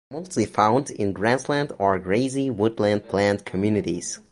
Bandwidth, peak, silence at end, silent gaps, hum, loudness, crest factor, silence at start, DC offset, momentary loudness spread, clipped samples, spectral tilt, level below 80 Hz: 11.5 kHz; -2 dBFS; 0.15 s; none; none; -23 LUFS; 20 dB; 0.1 s; under 0.1%; 6 LU; under 0.1%; -5.5 dB/octave; -52 dBFS